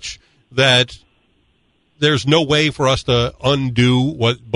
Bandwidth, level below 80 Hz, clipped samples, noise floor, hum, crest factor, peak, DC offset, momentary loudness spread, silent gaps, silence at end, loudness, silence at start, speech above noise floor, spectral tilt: 11 kHz; -42 dBFS; under 0.1%; -61 dBFS; none; 16 dB; 0 dBFS; under 0.1%; 6 LU; none; 0 s; -16 LUFS; 0.05 s; 45 dB; -5 dB/octave